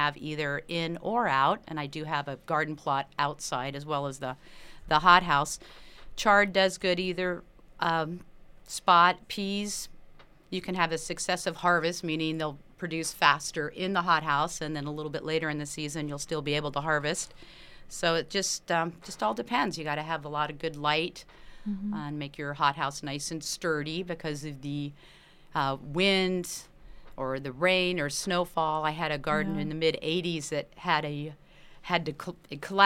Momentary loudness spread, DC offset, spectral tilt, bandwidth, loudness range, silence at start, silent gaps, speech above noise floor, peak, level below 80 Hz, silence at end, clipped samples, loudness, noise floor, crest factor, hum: 13 LU; under 0.1%; -3.5 dB/octave; 16 kHz; 6 LU; 0 s; none; 23 dB; -4 dBFS; -54 dBFS; 0 s; under 0.1%; -29 LUFS; -52 dBFS; 26 dB; none